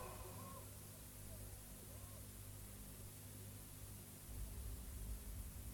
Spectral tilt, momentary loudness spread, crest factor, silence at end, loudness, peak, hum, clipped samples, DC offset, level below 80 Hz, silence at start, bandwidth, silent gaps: -4 dB/octave; 3 LU; 14 dB; 0 s; -54 LUFS; -38 dBFS; 50 Hz at -60 dBFS; under 0.1%; under 0.1%; -56 dBFS; 0 s; 18 kHz; none